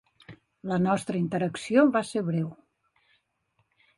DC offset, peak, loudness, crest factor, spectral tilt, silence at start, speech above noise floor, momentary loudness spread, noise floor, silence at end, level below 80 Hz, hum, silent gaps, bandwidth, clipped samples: under 0.1%; -10 dBFS; -26 LUFS; 18 dB; -7 dB/octave; 0.3 s; 48 dB; 10 LU; -73 dBFS; 1.45 s; -66 dBFS; none; none; 11.5 kHz; under 0.1%